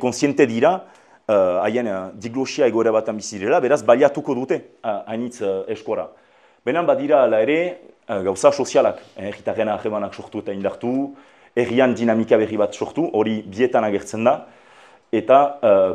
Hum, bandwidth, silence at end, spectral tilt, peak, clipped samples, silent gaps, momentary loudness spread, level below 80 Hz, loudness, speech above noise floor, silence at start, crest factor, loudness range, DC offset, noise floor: none; 11 kHz; 0 s; -5.5 dB/octave; 0 dBFS; under 0.1%; none; 12 LU; -66 dBFS; -20 LUFS; 30 dB; 0 s; 20 dB; 3 LU; under 0.1%; -49 dBFS